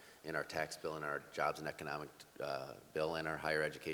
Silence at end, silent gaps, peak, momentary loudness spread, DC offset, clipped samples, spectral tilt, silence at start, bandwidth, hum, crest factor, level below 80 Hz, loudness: 0 s; none; -22 dBFS; 8 LU; under 0.1%; under 0.1%; -4 dB/octave; 0 s; over 20 kHz; none; 20 dB; -70 dBFS; -41 LUFS